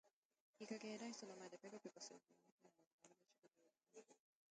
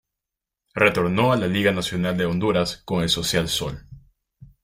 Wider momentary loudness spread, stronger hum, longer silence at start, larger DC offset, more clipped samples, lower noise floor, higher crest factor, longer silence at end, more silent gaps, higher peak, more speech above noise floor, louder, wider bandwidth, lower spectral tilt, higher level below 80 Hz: first, 16 LU vs 6 LU; neither; second, 0.05 s vs 0.75 s; neither; neither; second, -80 dBFS vs -86 dBFS; about the same, 22 dB vs 20 dB; first, 0.35 s vs 0.2 s; first, 0.13-0.30 s, 0.40-0.54 s, 2.52-2.58 s, 2.87-2.98 s vs none; second, -38 dBFS vs -2 dBFS; second, 22 dB vs 65 dB; second, -56 LUFS vs -22 LUFS; second, 9 kHz vs 16 kHz; about the same, -3.5 dB/octave vs -4.5 dB/octave; second, under -90 dBFS vs -48 dBFS